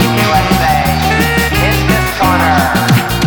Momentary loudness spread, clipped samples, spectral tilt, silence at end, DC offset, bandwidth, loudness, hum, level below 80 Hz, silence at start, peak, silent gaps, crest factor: 1 LU; under 0.1%; -5 dB/octave; 0 s; under 0.1%; over 20 kHz; -11 LUFS; none; -22 dBFS; 0 s; 0 dBFS; none; 10 dB